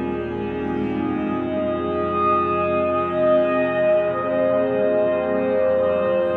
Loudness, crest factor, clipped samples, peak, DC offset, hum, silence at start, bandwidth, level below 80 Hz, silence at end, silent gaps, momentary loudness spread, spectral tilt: -21 LUFS; 12 dB; under 0.1%; -8 dBFS; under 0.1%; none; 0 s; 4.5 kHz; -48 dBFS; 0 s; none; 6 LU; -9 dB/octave